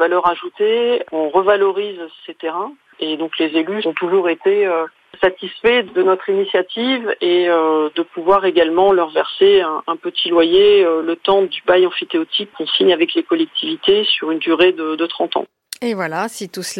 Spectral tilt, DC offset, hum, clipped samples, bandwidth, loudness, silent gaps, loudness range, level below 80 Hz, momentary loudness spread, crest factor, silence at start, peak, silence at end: -4 dB/octave; under 0.1%; none; under 0.1%; 12.5 kHz; -16 LUFS; none; 5 LU; -58 dBFS; 11 LU; 14 dB; 0 s; -2 dBFS; 0 s